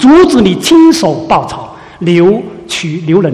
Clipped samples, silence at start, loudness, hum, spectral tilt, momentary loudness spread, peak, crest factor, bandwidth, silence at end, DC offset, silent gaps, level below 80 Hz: 2%; 0 s; -9 LUFS; none; -5.5 dB/octave; 14 LU; 0 dBFS; 8 dB; 14 kHz; 0 s; under 0.1%; none; -38 dBFS